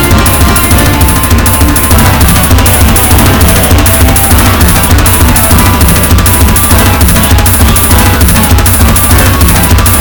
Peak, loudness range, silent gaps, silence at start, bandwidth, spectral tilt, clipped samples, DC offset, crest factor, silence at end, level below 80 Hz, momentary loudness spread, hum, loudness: 0 dBFS; 0 LU; none; 0 s; over 20 kHz; -4 dB/octave; 10%; under 0.1%; 4 dB; 0 s; -10 dBFS; 1 LU; none; -4 LUFS